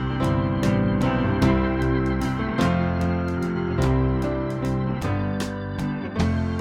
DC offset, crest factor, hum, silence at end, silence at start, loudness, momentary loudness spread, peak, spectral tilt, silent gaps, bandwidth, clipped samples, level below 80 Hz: under 0.1%; 16 dB; none; 0 s; 0 s; -23 LUFS; 6 LU; -6 dBFS; -7.5 dB/octave; none; 13.5 kHz; under 0.1%; -34 dBFS